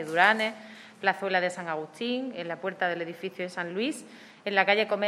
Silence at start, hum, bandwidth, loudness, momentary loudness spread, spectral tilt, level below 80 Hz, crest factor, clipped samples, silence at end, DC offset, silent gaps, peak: 0 s; none; 14.5 kHz; -28 LUFS; 14 LU; -4 dB/octave; -86 dBFS; 22 dB; under 0.1%; 0 s; under 0.1%; none; -6 dBFS